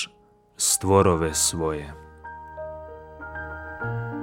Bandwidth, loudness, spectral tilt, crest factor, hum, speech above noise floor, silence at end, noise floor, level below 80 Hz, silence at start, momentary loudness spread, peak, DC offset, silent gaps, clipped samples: 17 kHz; -23 LUFS; -3.5 dB/octave; 22 dB; none; 35 dB; 0 s; -57 dBFS; -46 dBFS; 0 s; 22 LU; -4 dBFS; under 0.1%; none; under 0.1%